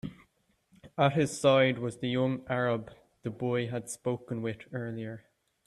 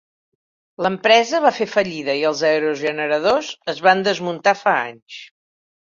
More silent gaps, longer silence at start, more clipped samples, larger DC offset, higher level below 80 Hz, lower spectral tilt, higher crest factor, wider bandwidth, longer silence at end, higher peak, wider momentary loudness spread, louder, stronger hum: second, none vs 5.02-5.06 s; second, 0.05 s vs 0.8 s; neither; neither; about the same, -66 dBFS vs -64 dBFS; first, -5.5 dB/octave vs -3.5 dB/octave; about the same, 20 dB vs 18 dB; first, 13 kHz vs 7.6 kHz; second, 0.5 s vs 0.65 s; second, -10 dBFS vs -2 dBFS; first, 17 LU vs 11 LU; second, -30 LUFS vs -18 LUFS; neither